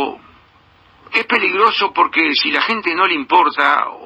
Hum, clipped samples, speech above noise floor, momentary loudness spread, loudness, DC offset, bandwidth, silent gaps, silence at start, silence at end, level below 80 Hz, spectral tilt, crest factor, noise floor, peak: none; under 0.1%; 35 dB; 4 LU; -14 LUFS; under 0.1%; 9.4 kHz; none; 0 s; 0 s; -60 dBFS; -4 dB/octave; 16 dB; -50 dBFS; 0 dBFS